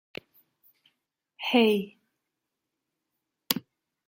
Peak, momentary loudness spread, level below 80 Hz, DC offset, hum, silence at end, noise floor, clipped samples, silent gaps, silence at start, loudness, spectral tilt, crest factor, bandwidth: -4 dBFS; 23 LU; -74 dBFS; under 0.1%; none; 0.5 s; -85 dBFS; under 0.1%; none; 1.4 s; -26 LUFS; -4 dB/octave; 28 dB; 16.5 kHz